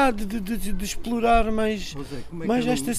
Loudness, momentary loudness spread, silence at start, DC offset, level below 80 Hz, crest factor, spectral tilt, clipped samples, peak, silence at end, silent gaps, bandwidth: -25 LUFS; 12 LU; 0 s; under 0.1%; -34 dBFS; 16 dB; -4.5 dB/octave; under 0.1%; -6 dBFS; 0 s; none; 15.5 kHz